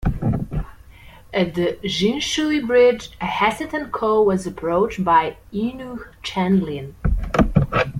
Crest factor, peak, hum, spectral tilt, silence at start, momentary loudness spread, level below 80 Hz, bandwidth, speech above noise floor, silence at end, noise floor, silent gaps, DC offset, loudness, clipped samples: 18 dB; -2 dBFS; none; -6 dB/octave; 0 s; 10 LU; -32 dBFS; 15.5 kHz; 24 dB; 0 s; -44 dBFS; none; under 0.1%; -20 LUFS; under 0.1%